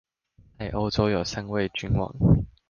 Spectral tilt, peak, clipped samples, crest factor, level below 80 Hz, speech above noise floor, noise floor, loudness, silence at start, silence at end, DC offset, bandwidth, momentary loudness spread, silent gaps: -7 dB/octave; -8 dBFS; under 0.1%; 18 dB; -38 dBFS; 35 dB; -59 dBFS; -26 LUFS; 0.6 s; 0.25 s; under 0.1%; 7.2 kHz; 8 LU; none